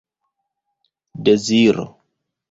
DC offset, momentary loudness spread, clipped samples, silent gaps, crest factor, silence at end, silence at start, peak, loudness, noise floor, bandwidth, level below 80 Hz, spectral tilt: under 0.1%; 11 LU; under 0.1%; none; 18 dB; 0.65 s; 1.15 s; -2 dBFS; -16 LUFS; -76 dBFS; 8 kHz; -58 dBFS; -5 dB/octave